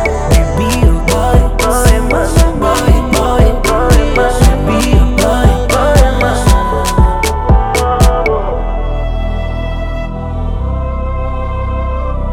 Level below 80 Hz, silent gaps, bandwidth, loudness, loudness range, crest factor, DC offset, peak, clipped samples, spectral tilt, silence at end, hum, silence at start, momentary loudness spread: -14 dBFS; none; 17 kHz; -12 LUFS; 8 LU; 10 dB; under 0.1%; 0 dBFS; 0.4%; -5.5 dB/octave; 0 s; none; 0 s; 9 LU